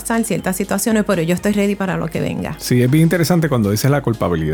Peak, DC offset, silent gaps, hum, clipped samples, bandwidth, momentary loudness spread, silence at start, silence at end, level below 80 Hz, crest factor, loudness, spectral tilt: -4 dBFS; under 0.1%; none; none; under 0.1%; 19 kHz; 7 LU; 0 s; 0 s; -40 dBFS; 14 dB; -17 LUFS; -6 dB/octave